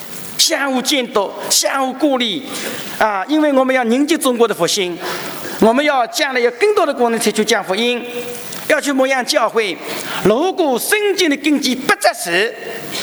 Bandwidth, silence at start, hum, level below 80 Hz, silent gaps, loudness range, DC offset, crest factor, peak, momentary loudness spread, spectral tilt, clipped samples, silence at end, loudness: over 20 kHz; 0 s; none; -58 dBFS; none; 1 LU; under 0.1%; 16 dB; 0 dBFS; 9 LU; -2.5 dB/octave; under 0.1%; 0 s; -16 LUFS